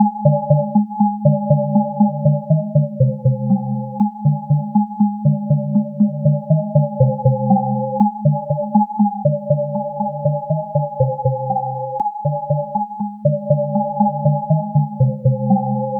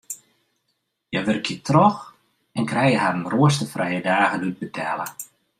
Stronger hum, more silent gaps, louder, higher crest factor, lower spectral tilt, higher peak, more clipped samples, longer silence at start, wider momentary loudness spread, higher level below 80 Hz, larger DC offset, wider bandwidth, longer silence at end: neither; neither; first, -18 LUFS vs -21 LUFS; about the same, 16 dB vs 20 dB; first, -15 dB/octave vs -5.5 dB/octave; about the same, 0 dBFS vs -2 dBFS; neither; about the same, 0 s vs 0.1 s; second, 5 LU vs 15 LU; first, -52 dBFS vs -62 dBFS; neither; second, 1.1 kHz vs 15.5 kHz; second, 0 s vs 0.35 s